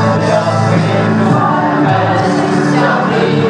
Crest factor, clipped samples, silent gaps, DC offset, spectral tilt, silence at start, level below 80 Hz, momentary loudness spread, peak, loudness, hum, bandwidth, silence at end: 10 dB; under 0.1%; none; under 0.1%; -7 dB/octave; 0 s; -48 dBFS; 1 LU; 0 dBFS; -12 LUFS; none; 10.5 kHz; 0 s